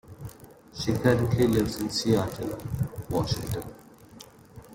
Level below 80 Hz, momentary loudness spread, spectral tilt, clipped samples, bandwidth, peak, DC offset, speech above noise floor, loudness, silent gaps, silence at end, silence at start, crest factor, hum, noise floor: -48 dBFS; 21 LU; -6 dB/octave; under 0.1%; 17 kHz; -8 dBFS; under 0.1%; 24 dB; -27 LUFS; none; 0 s; 0.05 s; 20 dB; none; -50 dBFS